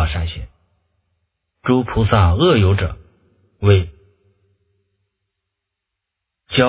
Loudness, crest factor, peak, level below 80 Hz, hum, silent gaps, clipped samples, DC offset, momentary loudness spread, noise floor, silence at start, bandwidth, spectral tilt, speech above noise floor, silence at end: -17 LUFS; 20 dB; 0 dBFS; -30 dBFS; none; none; under 0.1%; under 0.1%; 18 LU; -80 dBFS; 0 s; 4 kHz; -11 dB/octave; 66 dB; 0 s